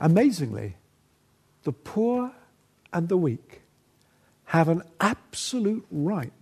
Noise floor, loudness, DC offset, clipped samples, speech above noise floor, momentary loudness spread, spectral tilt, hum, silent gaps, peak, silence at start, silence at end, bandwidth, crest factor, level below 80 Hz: -64 dBFS; -26 LUFS; under 0.1%; under 0.1%; 39 dB; 12 LU; -6.5 dB/octave; none; none; -6 dBFS; 0 s; 0.1 s; 13.5 kHz; 20 dB; -64 dBFS